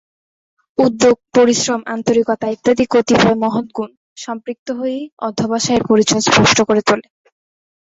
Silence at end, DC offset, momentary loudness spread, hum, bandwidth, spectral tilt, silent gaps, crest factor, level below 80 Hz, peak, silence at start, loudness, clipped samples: 0.95 s; under 0.1%; 14 LU; none; 8 kHz; -4 dB/octave; 3.97-4.16 s, 4.59-4.66 s, 5.12-5.17 s; 16 dB; -48 dBFS; 0 dBFS; 0.8 s; -15 LUFS; under 0.1%